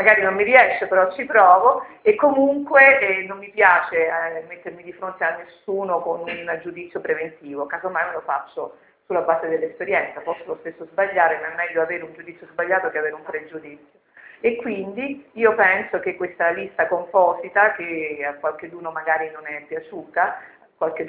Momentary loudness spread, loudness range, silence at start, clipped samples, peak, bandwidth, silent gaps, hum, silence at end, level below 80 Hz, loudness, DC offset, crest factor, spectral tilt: 18 LU; 11 LU; 0 s; under 0.1%; 0 dBFS; 4 kHz; none; none; 0 s; -66 dBFS; -20 LUFS; under 0.1%; 20 dB; -7.5 dB/octave